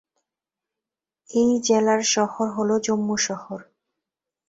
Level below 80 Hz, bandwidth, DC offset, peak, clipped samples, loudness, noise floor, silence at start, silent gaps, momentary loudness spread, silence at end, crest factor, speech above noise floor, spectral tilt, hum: -66 dBFS; 8 kHz; under 0.1%; -8 dBFS; under 0.1%; -22 LUFS; -88 dBFS; 1.3 s; none; 11 LU; 0.85 s; 18 dB; 67 dB; -3.5 dB/octave; none